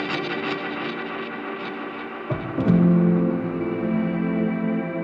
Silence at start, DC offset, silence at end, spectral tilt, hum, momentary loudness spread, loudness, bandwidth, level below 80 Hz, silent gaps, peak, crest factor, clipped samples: 0 s; under 0.1%; 0 s; -9 dB/octave; none; 13 LU; -24 LUFS; 5.6 kHz; -52 dBFS; none; -6 dBFS; 18 dB; under 0.1%